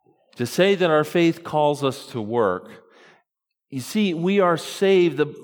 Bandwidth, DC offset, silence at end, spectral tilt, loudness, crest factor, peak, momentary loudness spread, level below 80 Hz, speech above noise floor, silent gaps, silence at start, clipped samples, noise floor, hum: over 20 kHz; under 0.1%; 0 s; -5.5 dB/octave; -21 LUFS; 16 dB; -6 dBFS; 12 LU; -72 dBFS; 56 dB; none; 0.4 s; under 0.1%; -77 dBFS; none